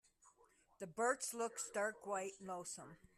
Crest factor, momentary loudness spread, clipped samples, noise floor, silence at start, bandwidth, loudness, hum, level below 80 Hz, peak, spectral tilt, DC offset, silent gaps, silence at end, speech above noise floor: 20 dB; 12 LU; under 0.1%; -73 dBFS; 0.25 s; 14 kHz; -43 LUFS; none; -82 dBFS; -26 dBFS; -2.5 dB/octave; under 0.1%; none; 0.2 s; 29 dB